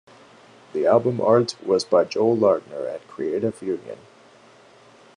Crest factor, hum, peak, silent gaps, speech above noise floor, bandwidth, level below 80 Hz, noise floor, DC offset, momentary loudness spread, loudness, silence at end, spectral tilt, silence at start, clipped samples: 18 dB; none; -4 dBFS; none; 30 dB; 10.5 kHz; -72 dBFS; -51 dBFS; under 0.1%; 13 LU; -22 LUFS; 1.2 s; -6 dB/octave; 0.75 s; under 0.1%